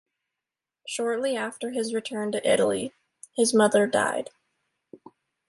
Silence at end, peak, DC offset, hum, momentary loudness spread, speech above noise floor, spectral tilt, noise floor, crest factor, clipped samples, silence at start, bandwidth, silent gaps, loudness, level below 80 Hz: 0.55 s; -8 dBFS; under 0.1%; none; 15 LU; 64 dB; -3.5 dB/octave; -88 dBFS; 20 dB; under 0.1%; 0.85 s; 12 kHz; none; -25 LUFS; -72 dBFS